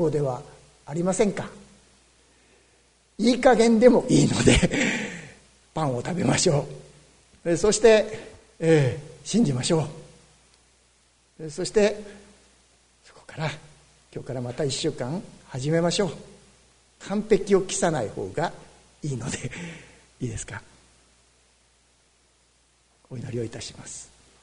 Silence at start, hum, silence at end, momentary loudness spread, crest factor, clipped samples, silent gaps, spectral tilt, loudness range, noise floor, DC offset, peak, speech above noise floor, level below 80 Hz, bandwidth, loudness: 0 s; none; 0.4 s; 21 LU; 24 dB; under 0.1%; none; -5 dB/octave; 17 LU; -63 dBFS; under 0.1%; -2 dBFS; 40 dB; -46 dBFS; 10.5 kHz; -24 LUFS